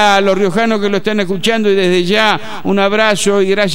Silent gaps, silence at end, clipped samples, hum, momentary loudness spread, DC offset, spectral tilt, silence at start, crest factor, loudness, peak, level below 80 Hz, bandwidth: none; 0 s; under 0.1%; none; 4 LU; 6%; -4.5 dB/octave; 0 s; 12 dB; -12 LUFS; 0 dBFS; -50 dBFS; 16.5 kHz